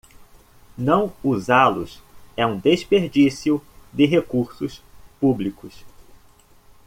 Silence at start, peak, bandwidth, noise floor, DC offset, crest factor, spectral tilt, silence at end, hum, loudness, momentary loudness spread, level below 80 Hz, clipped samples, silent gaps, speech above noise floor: 0.8 s; -2 dBFS; 15.5 kHz; -52 dBFS; under 0.1%; 20 dB; -6.5 dB/octave; 1 s; none; -20 LUFS; 15 LU; -52 dBFS; under 0.1%; none; 32 dB